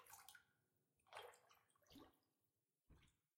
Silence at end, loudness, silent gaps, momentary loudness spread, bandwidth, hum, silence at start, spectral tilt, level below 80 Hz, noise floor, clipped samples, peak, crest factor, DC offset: 0.2 s; -64 LUFS; none; 7 LU; 16 kHz; none; 0 s; -2 dB/octave; -86 dBFS; under -90 dBFS; under 0.1%; -42 dBFS; 26 dB; under 0.1%